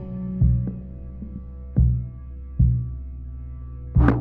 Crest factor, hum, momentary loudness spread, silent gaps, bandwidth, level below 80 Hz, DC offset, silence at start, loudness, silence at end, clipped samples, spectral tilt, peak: 20 dB; none; 16 LU; none; 3.4 kHz; -28 dBFS; under 0.1%; 0 s; -23 LUFS; 0 s; under 0.1%; -10.5 dB/octave; -4 dBFS